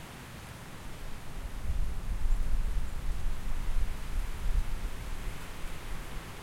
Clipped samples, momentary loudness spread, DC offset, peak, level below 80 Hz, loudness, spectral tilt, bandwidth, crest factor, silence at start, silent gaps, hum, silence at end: under 0.1%; 9 LU; under 0.1%; -16 dBFS; -34 dBFS; -40 LUFS; -5 dB/octave; 15.5 kHz; 14 dB; 0 s; none; none; 0 s